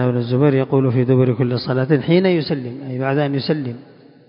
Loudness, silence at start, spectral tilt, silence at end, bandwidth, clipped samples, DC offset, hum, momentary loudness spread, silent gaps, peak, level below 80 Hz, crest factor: -18 LUFS; 0 s; -12.5 dB/octave; 0.45 s; 5.4 kHz; under 0.1%; under 0.1%; none; 9 LU; none; -4 dBFS; -56 dBFS; 14 dB